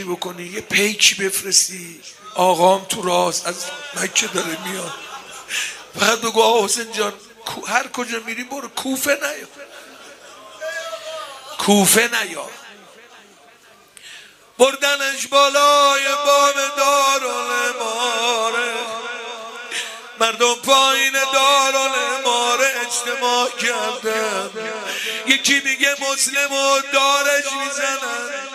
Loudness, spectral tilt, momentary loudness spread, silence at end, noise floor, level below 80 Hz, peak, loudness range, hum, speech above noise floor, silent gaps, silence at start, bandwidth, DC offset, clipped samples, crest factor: -17 LUFS; -1 dB/octave; 16 LU; 0 s; -49 dBFS; -68 dBFS; 0 dBFS; 7 LU; none; 30 dB; none; 0 s; 15.5 kHz; under 0.1%; under 0.1%; 20 dB